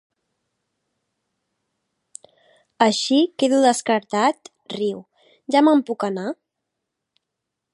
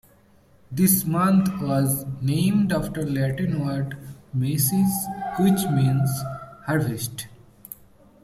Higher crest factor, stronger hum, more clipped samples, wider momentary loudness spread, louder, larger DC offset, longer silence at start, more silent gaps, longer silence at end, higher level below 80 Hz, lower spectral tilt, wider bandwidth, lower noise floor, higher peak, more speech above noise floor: about the same, 20 dB vs 18 dB; neither; neither; first, 18 LU vs 15 LU; first, -20 LUFS vs -23 LUFS; neither; first, 2.8 s vs 0.7 s; neither; first, 1.4 s vs 0.5 s; second, -78 dBFS vs -52 dBFS; second, -4 dB/octave vs -6 dB/octave; second, 11.5 kHz vs 15.5 kHz; first, -82 dBFS vs -56 dBFS; first, -2 dBFS vs -6 dBFS; first, 63 dB vs 34 dB